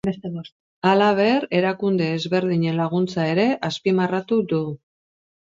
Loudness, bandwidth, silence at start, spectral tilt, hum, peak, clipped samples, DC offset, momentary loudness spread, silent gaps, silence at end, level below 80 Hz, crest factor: -21 LUFS; 7.8 kHz; 0.05 s; -7 dB/octave; none; -4 dBFS; under 0.1%; under 0.1%; 11 LU; 0.52-0.82 s; 0.75 s; -62 dBFS; 18 dB